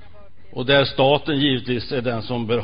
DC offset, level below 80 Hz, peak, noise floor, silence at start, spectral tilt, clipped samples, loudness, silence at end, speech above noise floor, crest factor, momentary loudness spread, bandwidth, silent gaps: 2%; -48 dBFS; -4 dBFS; -47 dBFS; 0.55 s; -10.5 dB/octave; under 0.1%; -20 LUFS; 0 s; 28 dB; 18 dB; 8 LU; 5.2 kHz; none